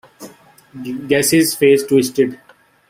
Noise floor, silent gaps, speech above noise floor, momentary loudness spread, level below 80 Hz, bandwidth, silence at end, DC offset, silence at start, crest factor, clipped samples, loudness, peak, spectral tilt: -41 dBFS; none; 26 dB; 15 LU; -58 dBFS; 16 kHz; 0.55 s; under 0.1%; 0.2 s; 16 dB; under 0.1%; -14 LUFS; -2 dBFS; -4 dB/octave